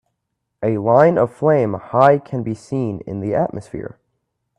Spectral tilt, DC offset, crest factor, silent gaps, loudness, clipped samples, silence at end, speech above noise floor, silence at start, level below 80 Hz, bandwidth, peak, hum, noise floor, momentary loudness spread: -8.5 dB/octave; under 0.1%; 18 dB; none; -18 LUFS; under 0.1%; 0.7 s; 58 dB; 0.6 s; -54 dBFS; 10.5 kHz; 0 dBFS; none; -76 dBFS; 14 LU